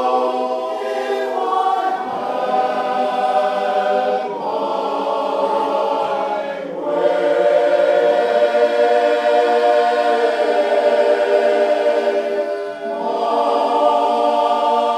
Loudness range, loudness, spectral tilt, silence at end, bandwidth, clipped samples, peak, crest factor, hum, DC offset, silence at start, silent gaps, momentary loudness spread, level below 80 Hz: 4 LU; -17 LUFS; -4 dB/octave; 0 s; 10.5 kHz; under 0.1%; -2 dBFS; 14 dB; none; under 0.1%; 0 s; none; 7 LU; -70 dBFS